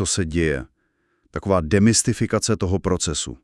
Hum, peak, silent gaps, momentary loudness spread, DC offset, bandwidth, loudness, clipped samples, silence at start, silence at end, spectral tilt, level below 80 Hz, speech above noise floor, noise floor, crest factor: none; -2 dBFS; none; 10 LU; under 0.1%; 12 kHz; -21 LUFS; under 0.1%; 0 s; 0.1 s; -4.5 dB/octave; -40 dBFS; 48 dB; -68 dBFS; 18 dB